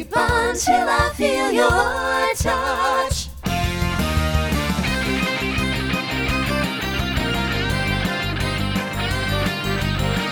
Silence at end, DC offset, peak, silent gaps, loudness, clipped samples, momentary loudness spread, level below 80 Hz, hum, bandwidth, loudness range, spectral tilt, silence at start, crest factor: 0 s; under 0.1%; -4 dBFS; none; -20 LUFS; under 0.1%; 5 LU; -30 dBFS; none; 19.5 kHz; 3 LU; -4.5 dB/octave; 0 s; 18 dB